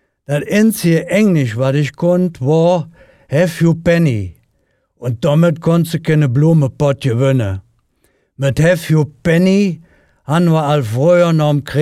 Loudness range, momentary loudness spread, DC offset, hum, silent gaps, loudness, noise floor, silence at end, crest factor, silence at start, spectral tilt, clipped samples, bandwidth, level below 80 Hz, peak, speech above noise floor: 2 LU; 8 LU; under 0.1%; none; none; -14 LUFS; -62 dBFS; 0 s; 12 dB; 0.3 s; -7 dB/octave; under 0.1%; 15 kHz; -46 dBFS; -2 dBFS; 49 dB